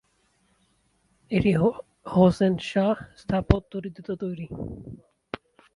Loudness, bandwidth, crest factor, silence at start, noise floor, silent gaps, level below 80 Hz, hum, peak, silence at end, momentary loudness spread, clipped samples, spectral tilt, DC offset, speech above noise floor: -25 LUFS; 11 kHz; 26 dB; 1.3 s; -68 dBFS; none; -42 dBFS; none; 0 dBFS; 0.8 s; 19 LU; under 0.1%; -8 dB/octave; under 0.1%; 43 dB